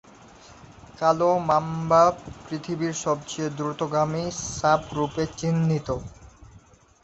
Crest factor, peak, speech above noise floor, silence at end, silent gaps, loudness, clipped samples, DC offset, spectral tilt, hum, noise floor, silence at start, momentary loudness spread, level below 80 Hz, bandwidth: 18 dB; -6 dBFS; 29 dB; 0.45 s; none; -24 LUFS; under 0.1%; under 0.1%; -5.5 dB/octave; none; -53 dBFS; 0.45 s; 12 LU; -52 dBFS; 8.2 kHz